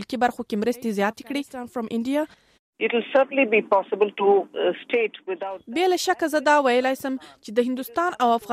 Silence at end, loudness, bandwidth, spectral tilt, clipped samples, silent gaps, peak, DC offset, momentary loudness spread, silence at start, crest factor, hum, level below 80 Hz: 0 s; -23 LUFS; 15.5 kHz; -4 dB/octave; under 0.1%; 2.59-2.73 s; -6 dBFS; under 0.1%; 12 LU; 0 s; 16 dB; none; -68 dBFS